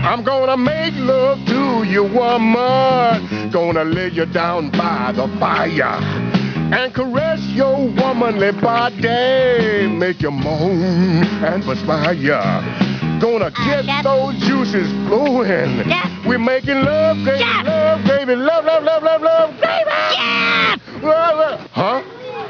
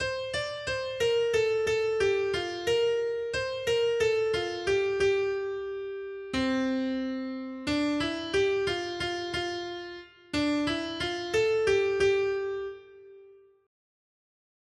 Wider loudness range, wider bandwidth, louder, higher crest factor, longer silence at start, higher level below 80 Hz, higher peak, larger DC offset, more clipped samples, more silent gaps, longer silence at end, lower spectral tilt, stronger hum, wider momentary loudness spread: about the same, 3 LU vs 3 LU; second, 5.4 kHz vs 12.5 kHz; first, -16 LUFS vs -29 LUFS; about the same, 16 dB vs 14 dB; about the same, 0 s vs 0 s; first, -46 dBFS vs -56 dBFS; first, 0 dBFS vs -14 dBFS; neither; neither; neither; second, 0 s vs 1.3 s; first, -7 dB/octave vs -4 dB/octave; neither; second, 5 LU vs 10 LU